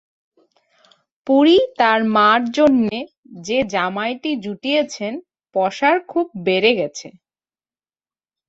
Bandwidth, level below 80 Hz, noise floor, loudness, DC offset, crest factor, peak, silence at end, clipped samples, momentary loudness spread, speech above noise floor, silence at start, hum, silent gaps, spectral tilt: 8 kHz; -60 dBFS; under -90 dBFS; -17 LUFS; under 0.1%; 18 dB; -2 dBFS; 1.4 s; under 0.1%; 14 LU; over 73 dB; 1.25 s; none; 3.18-3.23 s; -4.5 dB/octave